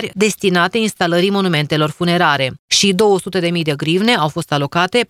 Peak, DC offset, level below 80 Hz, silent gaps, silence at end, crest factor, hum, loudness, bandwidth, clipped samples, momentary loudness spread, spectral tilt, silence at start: 0 dBFS; under 0.1%; -56 dBFS; 2.59-2.68 s; 0.05 s; 16 dB; none; -15 LUFS; 16 kHz; under 0.1%; 5 LU; -4 dB/octave; 0 s